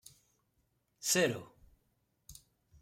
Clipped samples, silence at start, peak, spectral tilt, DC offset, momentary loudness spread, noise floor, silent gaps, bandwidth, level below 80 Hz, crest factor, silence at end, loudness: under 0.1%; 1 s; -16 dBFS; -2.5 dB/octave; under 0.1%; 26 LU; -78 dBFS; none; 16 kHz; -70 dBFS; 22 dB; 0.5 s; -33 LUFS